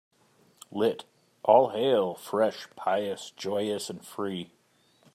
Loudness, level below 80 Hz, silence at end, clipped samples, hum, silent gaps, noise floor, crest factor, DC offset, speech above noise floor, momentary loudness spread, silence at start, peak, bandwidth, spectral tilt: -28 LUFS; -80 dBFS; 0.7 s; under 0.1%; none; none; -65 dBFS; 22 dB; under 0.1%; 38 dB; 16 LU; 0.7 s; -6 dBFS; 15 kHz; -5 dB/octave